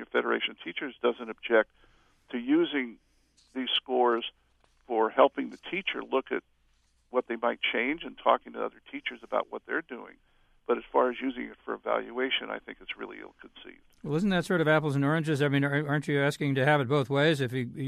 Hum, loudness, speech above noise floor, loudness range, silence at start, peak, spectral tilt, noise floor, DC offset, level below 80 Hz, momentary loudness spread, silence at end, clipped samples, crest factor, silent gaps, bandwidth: none; -29 LUFS; 39 dB; 6 LU; 0 s; -8 dBFS; -6.5 dB/octave; -68 dBFS; under 0.1%; -66 dBFS; 14 LU; 0 s; under 0.1%; 22 dB; none; 13.5 kHz